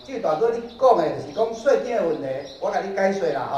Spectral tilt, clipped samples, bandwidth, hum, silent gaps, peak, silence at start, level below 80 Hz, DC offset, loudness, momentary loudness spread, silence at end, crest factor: -5.5 dB/octave; under 0.1%; 10 kHz; none; none; -4 dBFS; 0 s; -60 dBFS; under 0.1%; -22 LUFS; 8 LU; 0 s; 18 dB